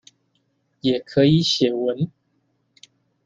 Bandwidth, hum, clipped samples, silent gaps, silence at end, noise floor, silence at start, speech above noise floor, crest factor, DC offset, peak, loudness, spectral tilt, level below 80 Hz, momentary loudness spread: 7.8 kHz; none; under 0.1%; none; 1.2 s; -68 dBFS; 0.85 s; 49 dB; 18 dB; under 0.1%; -4 dBFS; -20 LUFS; -6 dB/octave; -60 dBFS; 10 LU